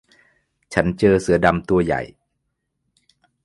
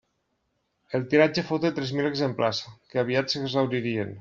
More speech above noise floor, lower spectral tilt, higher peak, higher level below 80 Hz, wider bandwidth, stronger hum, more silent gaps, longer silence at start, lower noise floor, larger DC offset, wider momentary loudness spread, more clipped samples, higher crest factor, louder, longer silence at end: first, 57 dB vs 49 dB; first, -6.5 dB/octave vs -4.5 dB/octave; first, 0 dBFS vs -6 dBFS; first, -42 dBFS vs -64 dBFS; first, 11.5 kHz vs 7.6 kHz; neither; neither; second, 0.7 s vs 0.9 s; about the same, -75 dBFS vs -75 dBFS; neither; about the same, 9 LU vs 10 LU; neither; about the same, 22 dB vs 22 dB; first, -19 LUFS vs -26 LUFS; first, 1.4 s vs 0 s